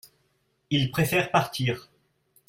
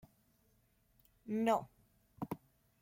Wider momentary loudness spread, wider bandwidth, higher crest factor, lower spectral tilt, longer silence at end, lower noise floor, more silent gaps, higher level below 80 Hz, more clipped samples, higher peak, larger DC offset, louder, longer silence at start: second, 7 LU vs 21 LU; about the same, 16.5 kHz vs 16.5 kHz; about the same, 20 dB vs 22 dB; second, -5 dB/octave vs -6.5 dB/octave; first, 0.7 s vs 0.45 s; about the same, -71 dBFS vs -74 dBFS; neither; first, -58 dBFS vs -74 dBFS; neither; first, -8 dBFS vs -20 dBFS; neither; first, -26 LUFS vs -39 LUFS; second, 0.7 s vs 1.25 s